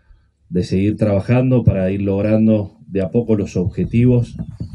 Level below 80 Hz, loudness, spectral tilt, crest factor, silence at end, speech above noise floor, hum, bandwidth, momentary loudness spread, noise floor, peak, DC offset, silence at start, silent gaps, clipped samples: -38 dBFS; -17 LUFS; -9.5 dB/octave; 16 dB; 0 s; 35 dB; none; 9.8 kHz; 9 LU; -51 dBFS; -2 dBFS; under 0.1%; 0.5 s; none; under 0.1%